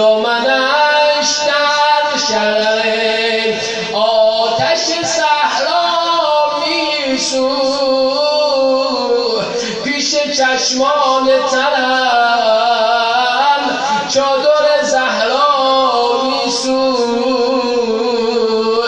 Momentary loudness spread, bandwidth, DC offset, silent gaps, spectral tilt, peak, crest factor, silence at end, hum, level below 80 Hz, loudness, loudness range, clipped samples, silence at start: 3 LU; 9.8 kHz; under 0.1%; none; -1.5 dB/octave; -2 dBFS; 12 dB; 0 s; none; -54 dBFS; -13 LUFS; 2 LU; under 0.1%; 0 s